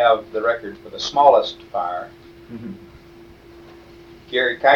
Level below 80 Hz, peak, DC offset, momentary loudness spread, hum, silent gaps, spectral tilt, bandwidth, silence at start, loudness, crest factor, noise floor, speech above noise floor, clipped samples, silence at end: -54 dBFS; 0 dBFS; under 0.1%; 22 LU; none; none; -3.5 dB/octave; 7.4 kHz; 0 s; -19 LUFS; 20 dB; -45 dBFS; 26 dB; under 0.1%; 0 s